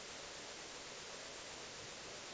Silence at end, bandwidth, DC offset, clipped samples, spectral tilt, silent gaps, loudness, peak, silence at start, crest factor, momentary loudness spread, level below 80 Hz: 0 s; 8 kHz; under 0.1%; under 0.1%; -1 dB/octave; none; -48 LUFS; -38 dBFS; 0 s; 12 dB; 0 LU; -72 dBFS